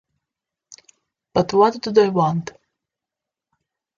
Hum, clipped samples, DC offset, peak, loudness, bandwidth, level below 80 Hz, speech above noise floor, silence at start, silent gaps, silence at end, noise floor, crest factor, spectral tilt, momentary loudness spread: none; under 0.1%; under 0.1%; -2 dBFS; -19 LUFS; 7.4 kHz; -58 dBFS; 69 dB; 1.35 s; none; 1.5 s; -86 dBFS; 20 dB; -6.5 dB/octave; 10 LU